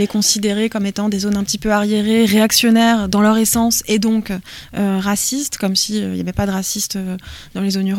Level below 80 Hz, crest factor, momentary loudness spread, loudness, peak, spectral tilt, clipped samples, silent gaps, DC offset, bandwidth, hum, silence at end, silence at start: -42 dBFS; 16 dB; 10 LU; -16 LUFS; 0 dBFS; -3.5 dB/octave; under 0.1%; none; under 0.1%; 17 kHz; none; 0 s; 0 s